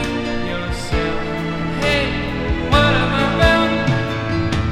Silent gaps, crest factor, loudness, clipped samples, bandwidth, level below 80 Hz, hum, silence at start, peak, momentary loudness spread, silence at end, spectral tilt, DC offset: none; 18 dB; -18 LUFS; under 0.1%; 15 kHz; -28 dBFS; none; 0 s; 0 dBFS; 9 LU; 0 s; -6 dB/octave; under 0.1%